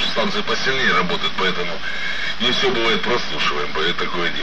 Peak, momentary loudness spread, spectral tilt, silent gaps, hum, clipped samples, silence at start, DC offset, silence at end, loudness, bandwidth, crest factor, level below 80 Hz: -6 dBFS; 6 LU; -3.5 dB/octave; none; none; under 0.1%; 0 s; 7%; 0 s; -19 LUFS; 12.5 kHz; 16 dB; -44 dBFS